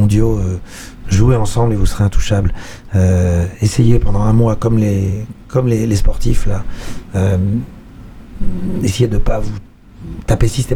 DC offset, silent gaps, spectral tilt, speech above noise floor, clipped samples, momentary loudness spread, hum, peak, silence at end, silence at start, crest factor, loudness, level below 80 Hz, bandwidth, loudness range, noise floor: under 0.1%; none; -7 dB/octave; 21 dB; under 0.1%; 15 LU; none; 0 dBFS; 0 s; 0 s; 12 dB; -16 LUFS; -22 dBFS; 13.5 kHz; 5 LU; -34 dBFS